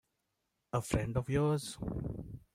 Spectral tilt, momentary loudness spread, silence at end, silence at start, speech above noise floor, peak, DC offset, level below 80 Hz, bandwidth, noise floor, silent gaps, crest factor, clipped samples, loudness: -6.5 dB/octave; 10 LU; 0.15 s; 0.75 s; 49 dB; -14 dBFS; under 0.1%; -52 dBFS; 16 kHz; -84 dBFS; none; 22 dB; under 0.1%; -36 LUFS